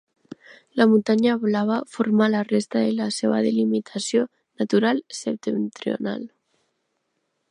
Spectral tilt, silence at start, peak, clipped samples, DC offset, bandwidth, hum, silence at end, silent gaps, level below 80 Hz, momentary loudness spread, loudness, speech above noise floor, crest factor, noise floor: -5.5 dB/octave; 0.75 s; -4 dBFS; under 0.1%; under 0.1%; 11 kHz; none; 1.25 s; none; -72 dBFS; 11 LU; -22 LUFS; 53 dB; 18 dB; -74 dBFS